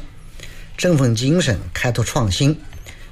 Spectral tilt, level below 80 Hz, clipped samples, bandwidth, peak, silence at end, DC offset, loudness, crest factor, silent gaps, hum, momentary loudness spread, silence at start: -5 dB/octave; -36 dBFS; under 0.1%; 15 kHz; -6 dBFS; 0 s; under 0.1%; -18 LUFS; 14 dB; none; none; 22 LU; 0 s